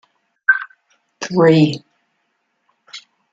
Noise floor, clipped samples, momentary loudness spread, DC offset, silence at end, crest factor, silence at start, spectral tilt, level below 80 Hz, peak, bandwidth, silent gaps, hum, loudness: -69 dBFS; under 0.1%; 25 LU; under 0.1%; 0.35 s; 18 dB; 0.5 s; -6.5 dB/octave; -64 dBFS; -2 dBFS; 7.8 kHz; none; none; -15 LUFS